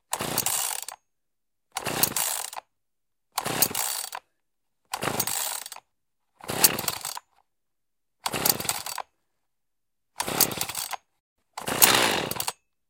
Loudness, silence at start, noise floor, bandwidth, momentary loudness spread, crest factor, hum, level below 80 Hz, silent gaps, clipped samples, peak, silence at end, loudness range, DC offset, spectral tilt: -25 LUFS; 0.1 s; -87 dBFS; 17.5 kHz; 18 LU; 30 dB; none; -60 dBFS; 11.20-11.36 s; under 0.1%; 0 dBFS; 0.4 s; 5 LU; under 0.1%; -1 dB/octave